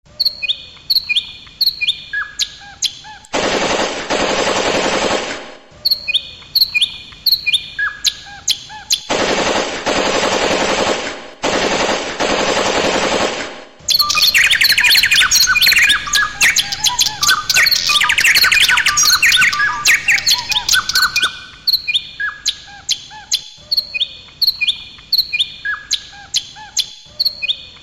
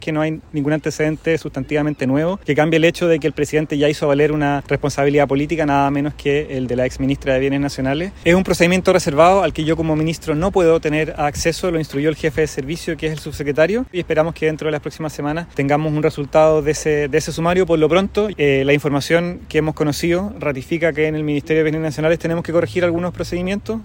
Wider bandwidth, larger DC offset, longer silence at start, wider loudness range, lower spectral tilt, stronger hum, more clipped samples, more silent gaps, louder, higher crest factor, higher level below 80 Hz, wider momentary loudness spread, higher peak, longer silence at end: about the same, 16.5 kHz vs 16.5 kHz; neither; first, 0.2 s vs 0 s; first, 7 LU vs 4 LU; second, 0 dB/octave vs -6 dB/octave; neither; neither; neither; first, -13 LUFS vs -18 LUFS; about the same, 16 dB vs 18 dB; second, -44 dBFS vs -38 dBFS; first, 12 LU vs 7 LU; about the same, 0 dBFS vs 0 dBFS; about the same, 0.05 s vs 0 s